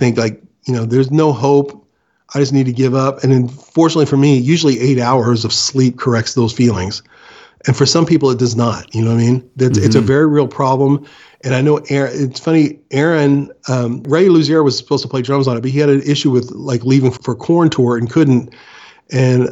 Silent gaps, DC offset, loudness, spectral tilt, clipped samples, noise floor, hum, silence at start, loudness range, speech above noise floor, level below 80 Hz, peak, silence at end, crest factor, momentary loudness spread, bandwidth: none; under 0.1%; -14 LUFS; -6 dB/octave; under 0.1%; -56 dBFS; none; 0 s; 2 LU; 43 dB; -54 dBFS; 0 dBFS; 0 s; 14 dB; 7 LU; 8 kHz